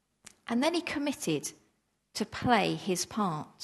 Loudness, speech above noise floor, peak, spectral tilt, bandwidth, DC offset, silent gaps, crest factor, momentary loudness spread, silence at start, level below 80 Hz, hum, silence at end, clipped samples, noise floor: -31 LUFS; 43 dB; -10 dBFS; -4 dB/octave; 13 kHz; under 0.1%; none; 22 dB; 11 LU; 0.45 s; -64 dBFS; none; 0 s; under 0.1%; -74 dBFS